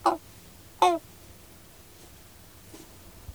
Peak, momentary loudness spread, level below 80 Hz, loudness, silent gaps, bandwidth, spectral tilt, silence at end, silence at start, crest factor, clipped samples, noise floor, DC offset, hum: -8 dBFS; 25 LU; -58 dBFS; -27 LUFS; none; over 20 kHz; -4 dB/octave; 0 s; 0.05 s; 24 dB; under 0.1%; -51 dBFS; 0.1%; none